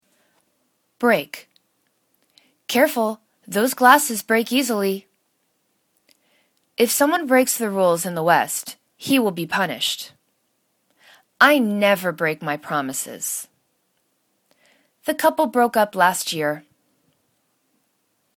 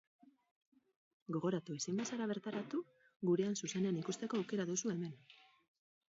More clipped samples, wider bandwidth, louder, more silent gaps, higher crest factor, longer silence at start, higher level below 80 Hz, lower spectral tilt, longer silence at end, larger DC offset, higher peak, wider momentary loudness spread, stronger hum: neither; first, 19 kHz vs 7.6 kHz; first, -20 LUFS vs -40 LUFS; second, none vs 3.16-3.20 s; first, 22 dB vs 16 dB; second, 1 s vs 1.3 s; first, -72 dBFS vs -86 dBFS; second, -3 dB/octave vs -6 dB/octave; first, 1.8 s vs 0.8 s; neither; first, 0 dBFS vs -24 dBFS; first, 14 LU vs 8 LU; neither